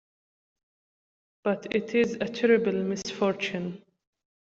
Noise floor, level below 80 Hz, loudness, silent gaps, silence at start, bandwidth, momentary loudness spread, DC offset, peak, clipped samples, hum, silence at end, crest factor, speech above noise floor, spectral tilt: under -90 dBFS; -68 dBFS; -27 LUFS; none; 1.45 s; 7.8 kHz; 11 LU; under 0.1%; -10 dBFS; under 0.1%; none; 0.8 s; 20 dB; over 63 dB; -5.5 dB/octave